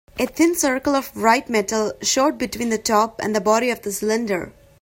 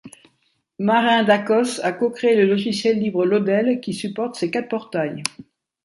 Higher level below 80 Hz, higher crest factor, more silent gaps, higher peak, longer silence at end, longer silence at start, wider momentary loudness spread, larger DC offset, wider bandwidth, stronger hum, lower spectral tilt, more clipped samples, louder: first, -52 dBFS vs -68 dBFS; about the same, 18 dB vs 18 dB; neither; about the same, -2 dBFS vs -2 dBFS; second, 0.3 s vs 0.45 s; about the same, 0.15 s vs 0.05 s; about the same, 7 LU vs 9 LU; neither; first, 16.5 kHz vs 11.5 kHz; neither; second, -3 dB/octave vs -5 dB/octave; neither; about the same, -20 LUFS vs -20 LUFS